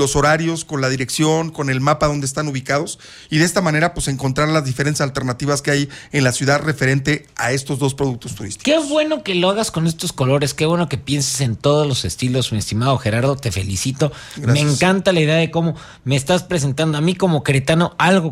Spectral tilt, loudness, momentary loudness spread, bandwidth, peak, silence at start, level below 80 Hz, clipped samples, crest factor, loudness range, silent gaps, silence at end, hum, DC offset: -5 dB/octave; -18 LUFS; 6 LU; 15.5 kHz; -2 dBFS; 0 s; -42 dBFS; under 0.1%; 14 dB; 2 LU; none; 0 s; none; under 0.1%